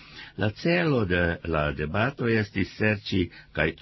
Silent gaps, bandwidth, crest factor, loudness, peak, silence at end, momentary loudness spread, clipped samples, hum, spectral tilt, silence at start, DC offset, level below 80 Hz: none; 6 kHz; 16 dB; -26 LUFS; -10 dBFS; 0.05 s; 6 LU; under 0.1%; none; -7.5 dB/octave; 0 s; under 0.1%; -42 dBFS